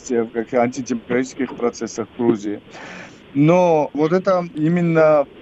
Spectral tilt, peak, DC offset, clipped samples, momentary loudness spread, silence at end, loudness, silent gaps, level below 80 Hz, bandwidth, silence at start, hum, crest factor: -7 dB/octave; -2 dBFS; under 0.1%; under 0.1%; 15 LU; 0 s; -19 LUFS; none; -58 dBFS; 8.2 kHz; 0.05 s; none; 16 dB